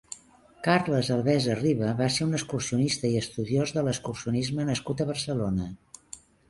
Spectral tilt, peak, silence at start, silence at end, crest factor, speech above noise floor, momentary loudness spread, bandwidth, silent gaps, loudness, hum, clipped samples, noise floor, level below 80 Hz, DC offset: -5.5 dB/octave; -10 dBFS; 0.1 s; 0.3 s; 18 dB; 28 dB; 15 LU; 11.5 kHz; none; -27 LUFS; none; under 0.1%; -54 dBFS; -54 dBFS; under 0.1%